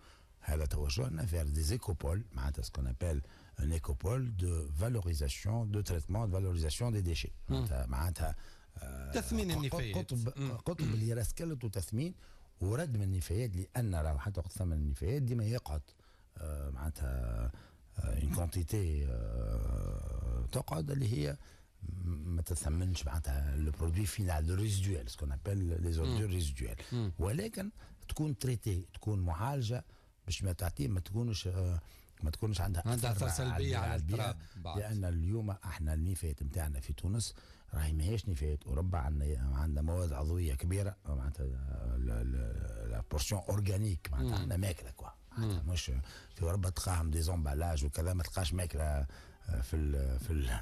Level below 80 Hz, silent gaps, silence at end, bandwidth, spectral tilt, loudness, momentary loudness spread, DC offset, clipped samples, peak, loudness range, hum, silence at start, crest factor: -42 dBFS; none; 0 s; 14 kHz; -6 dB/octave; -37 LUFS; 7 LU; under 0.1%; under 0.1%; -24 dBFS; 2 LU; none; 0.05 s; 10 dB